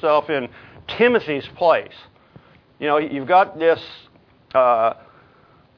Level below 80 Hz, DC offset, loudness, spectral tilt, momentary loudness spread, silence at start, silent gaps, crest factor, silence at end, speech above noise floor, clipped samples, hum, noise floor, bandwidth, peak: -60 dBFS; under 0.1%; -19 LUFS; -7 dB/octave; 18 LU; 0 s; none; 18 dB; 0.85 s; 34 dB; under 0.1%; none; -53 dBFS; 5.4 kHz; -2 dBFS